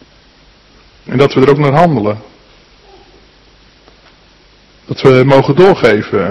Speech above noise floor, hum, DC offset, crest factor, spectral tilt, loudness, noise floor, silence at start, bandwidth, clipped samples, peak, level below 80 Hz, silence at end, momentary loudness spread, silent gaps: 36 dB; none; under 0.1%; 12 dB; -7.5 dB/octave; -9 LUFS; -45 dBFS; 1.1 s; 9.8 kHz; 2%; 0 dBFS; -44 dBFS; 0 s; 12 LU; none